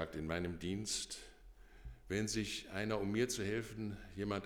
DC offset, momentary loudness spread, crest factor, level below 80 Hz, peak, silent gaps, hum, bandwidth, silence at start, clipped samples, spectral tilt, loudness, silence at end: under 0.1%; 14 LU; 18 dB; -58 dBFS; -24 dBFS; none; none; 19 kHz; 0 s; under 0.1%; -4 dB/octave; -40 LUFS; 0 s